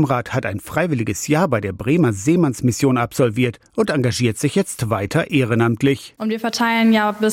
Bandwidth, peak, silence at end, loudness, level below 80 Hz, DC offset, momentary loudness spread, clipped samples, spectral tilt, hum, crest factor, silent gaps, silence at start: 16.5 kHz; -6 dBFS; 0 s; -19 LUFS; -52 dBFS; under 0.1%; 6 LU; under 0.1%; -5.5 dB/octave; none; 12 dB; none; 0 s